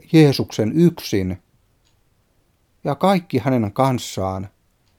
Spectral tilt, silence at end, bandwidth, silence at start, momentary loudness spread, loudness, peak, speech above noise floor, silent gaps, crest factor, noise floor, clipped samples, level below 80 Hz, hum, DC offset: -6.5 dB/octave; 0.5 s; 17 kHz; 0.1 s; 14 LU; -19 LUFS; -2 dBFS; 44 dB; none; 18 dB; -62 dBFS; under 0.1%; -56 dBFS; none; under 0.1%